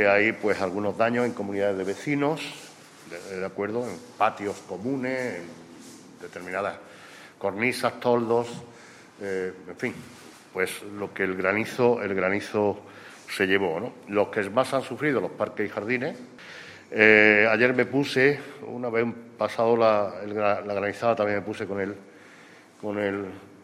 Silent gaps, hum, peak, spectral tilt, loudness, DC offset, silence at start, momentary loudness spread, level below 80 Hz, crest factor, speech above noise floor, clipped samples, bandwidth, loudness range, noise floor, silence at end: none; none; -2 dBFS; -5.5 dB/octave; -25 LUFS; under 0.1%; 0 s; 20 LU; -70 dBFS; 24 dB; 25 dB; under 0.1%; 14.5 kHz; 9 LU; -50 dBFS; 0.05 s